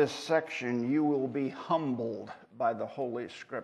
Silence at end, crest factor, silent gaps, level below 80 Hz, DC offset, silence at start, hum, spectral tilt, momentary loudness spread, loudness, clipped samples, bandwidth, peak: 0 s; 18 dB; none; -78 dBFS; under 0.1%; 0 s; none; -6 dB/octave; 11 LU; -32 LUFS; under 0.1%; 12 kHz; -14 dBFS